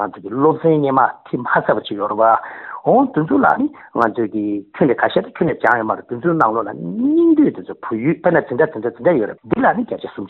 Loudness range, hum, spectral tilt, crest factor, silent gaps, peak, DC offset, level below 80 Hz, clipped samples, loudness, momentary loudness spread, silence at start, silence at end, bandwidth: 1 LU; none; -6 dB/octave; 16 dB; none; 0 dBFS; under 0.1%; -56 dBFS; under 0.1%; -17 LUFS; 8 LU; 0 s; 0 s; 4.3 kHz